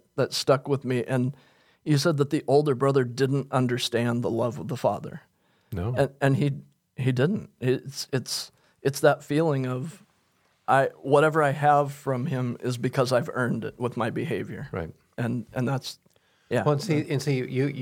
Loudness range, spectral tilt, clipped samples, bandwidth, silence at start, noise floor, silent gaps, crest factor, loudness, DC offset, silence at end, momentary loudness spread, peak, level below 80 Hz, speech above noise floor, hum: 5 LU; -6 dB/octave; under 0.1%; 16 kHz; 0.15 s; -67 dBFS; none; 20 dB; -26 LUFS; under 0.1%; 0 s; 12 LU; -6 dBFS; -62 dBFS; 42 dB; none